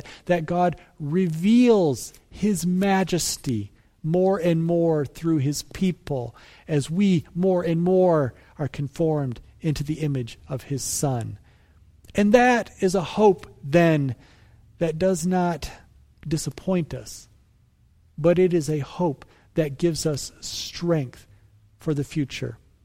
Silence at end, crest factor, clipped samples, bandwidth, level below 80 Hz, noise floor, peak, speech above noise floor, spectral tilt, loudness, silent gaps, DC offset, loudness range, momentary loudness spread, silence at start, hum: 0.3 s; 20 dB; under 0.1%; 16 kHz; -50 dBFS; -59 dBFS; -4 dBFS; 36 dB; -6 dB/octave; -23 LUFS; none; under 0.1%; 6 LU; 14 LU; 0.05 s; none